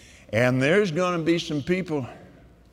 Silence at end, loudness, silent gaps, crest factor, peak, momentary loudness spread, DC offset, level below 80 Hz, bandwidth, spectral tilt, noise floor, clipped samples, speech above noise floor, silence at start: 0.45 s; -24 LUFS; none; 18 dB; -8 dBFS; 10 LU; under 0.1%; -56 dBFS; 14 kHz; -6 dB/octave; -50 dBFS; under 0.1%; 27 dB; 0.3 s